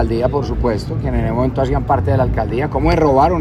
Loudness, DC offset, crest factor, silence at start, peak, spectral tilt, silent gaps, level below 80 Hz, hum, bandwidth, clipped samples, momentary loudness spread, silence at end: -17 LUFS; under 0.1%; 14 dB; 0 s; 0 dBFS; -8.5 dB/octave; none; -24 dBFS; none; 11 kHz; under 0.1%; 6 LU; 0 s